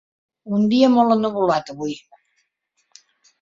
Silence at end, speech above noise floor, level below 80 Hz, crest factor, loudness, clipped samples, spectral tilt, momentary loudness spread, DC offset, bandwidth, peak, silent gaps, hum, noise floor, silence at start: 1.45 s; 53 dB; -62 dBFS; 18 dB; -19 LUFS; under 0.1%; -6.5 dB/octave; 15 LU; under 0.1%; 7.6 kHz; -2 dBFS; none; none; -70 dBFS; 0.45 s